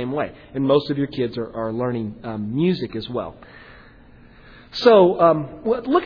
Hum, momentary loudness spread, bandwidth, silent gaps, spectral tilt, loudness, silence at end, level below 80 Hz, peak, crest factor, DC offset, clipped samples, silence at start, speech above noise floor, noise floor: none; 15 LU; 5.4 kHz; none; -8 dB/octave; -20 LUFS; 0 s; -52 dBFS; -2 dBFS; 20 dB; under 0.1%; under 0.1%; 0 s; 27 dB; -47 dBFS